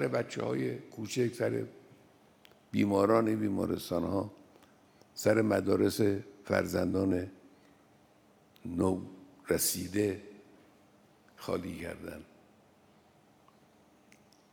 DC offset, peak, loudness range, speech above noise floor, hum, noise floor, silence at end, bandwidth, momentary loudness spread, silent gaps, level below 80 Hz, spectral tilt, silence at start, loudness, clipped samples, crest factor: under 0.1%; -12 dBFS; 13 LU; 33 dB; none; -64 dBFS; 2.3 s; over 20 kHz; 17 LU; none; -70 dBFS; -5.5 dB/octave; 0 s; -32 LUFS; under 0.1%; 22 dB